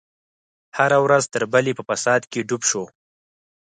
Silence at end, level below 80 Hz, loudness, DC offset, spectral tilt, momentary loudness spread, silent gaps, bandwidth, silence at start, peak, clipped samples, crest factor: 0.75 s; -68 dBFS; -20 LUFS; under 0.1%; -3.5 dB/octave; 10 LU; none; 9.6 kHz; 0.75 s; -4 dBFS; under 0.1%; 18 dB